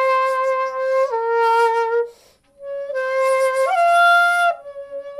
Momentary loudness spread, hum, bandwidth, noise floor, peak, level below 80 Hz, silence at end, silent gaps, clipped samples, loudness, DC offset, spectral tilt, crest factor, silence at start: 17 LU; none; 15 kHz; -51 dBFS; -6 dBFS; -68 dBFS; 0 s; none; under 0.1%; -17 LUFS; under 0.1%; 0.5 dB/octave; 12 dB; 0 s